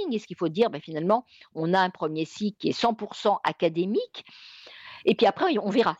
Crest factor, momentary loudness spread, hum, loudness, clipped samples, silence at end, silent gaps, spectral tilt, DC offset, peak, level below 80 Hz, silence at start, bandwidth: 16 dB; 20 LU; none; -26 LUFS; under 0.1%; 0.05 s; none; -6 dB/octave; under 0.1%; -10 dBFS; -70 dBFS; 0 s; 8.2 kHz